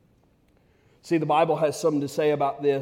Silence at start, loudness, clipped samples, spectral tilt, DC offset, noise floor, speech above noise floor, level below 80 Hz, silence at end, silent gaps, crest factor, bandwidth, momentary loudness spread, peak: 1.05 s; -24 LUFS; under 0.1%; -6 dB/octave; under 0.1%; -62 dBFS; 39 dB; -68 dBFS; 0 s; none; 16 dB; 16.5 kHz; 4 LU; -8 dBFS